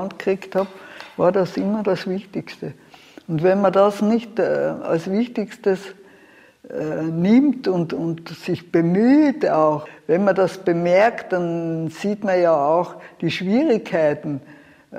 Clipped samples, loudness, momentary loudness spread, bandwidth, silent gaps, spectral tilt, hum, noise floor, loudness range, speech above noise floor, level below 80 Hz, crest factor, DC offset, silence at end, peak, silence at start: under 0.1%; -20 LUFS; 13 LU; 14 kHz; none; -7.5 dB/octave; none; -50 dBFS; 4 LU; 31 dB; -64 dBFS; 16 dB; under 0.1%; 0 s; -4 dBFS; 0 s